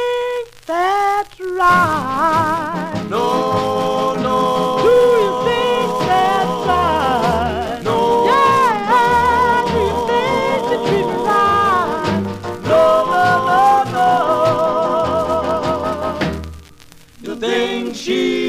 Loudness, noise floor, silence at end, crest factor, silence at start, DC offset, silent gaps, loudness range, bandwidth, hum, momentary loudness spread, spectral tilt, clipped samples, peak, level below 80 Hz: -16 LUFS; -42 dBFS; 0 s; 14 dB; 0 s; 0.2%; none; 3 LU; 15.5 kHz; none; 9 LU; -5 dB/octave; under 0.1%; -2 dBFS; -40 dBFS